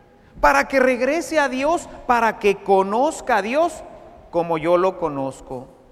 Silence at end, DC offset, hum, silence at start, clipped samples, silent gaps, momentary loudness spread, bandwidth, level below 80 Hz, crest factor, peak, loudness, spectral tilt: 0.25 s; under 0.1%; none; 0.35 s; under 0.1%; none; 11 LU; 15 kHz; -44 dBFS; 18 dB; -2 dBFS; -20 LUFS; -4.5 dB/octave